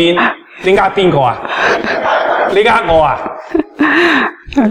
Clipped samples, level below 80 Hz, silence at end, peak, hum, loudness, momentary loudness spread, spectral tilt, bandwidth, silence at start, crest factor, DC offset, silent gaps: under 0.1%; -38 dBFS; 0 s; 0 dBFS; none; -12 LUFS; 8 LU; -5.5 dB/octave; 11.5 kHz; 0 s; 12 dB; under 0.1%; none